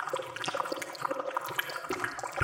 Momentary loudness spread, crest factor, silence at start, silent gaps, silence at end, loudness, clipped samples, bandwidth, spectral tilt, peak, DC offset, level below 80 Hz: 2 LU; 24 dB; 0 s; none; 0 s; -34 LUFS; under 0.1%; 17 kHz; -3 dB/octave; -12 dBFS; under 0.1%; -72 dBFS